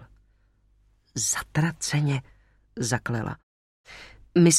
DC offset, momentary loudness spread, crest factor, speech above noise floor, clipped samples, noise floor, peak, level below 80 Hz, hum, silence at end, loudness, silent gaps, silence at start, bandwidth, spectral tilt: under 0.1%; 20 LU; 20 dB; 36 dB; under 0.1%; -63 dBFS; -6 dBFS; -54 dBFS; 50 Hz at -45 dBFS; 0 s; -27 LUFS; 3.43-3.84 s; 0 s; 14.5 kHz; -4.5 dB/octave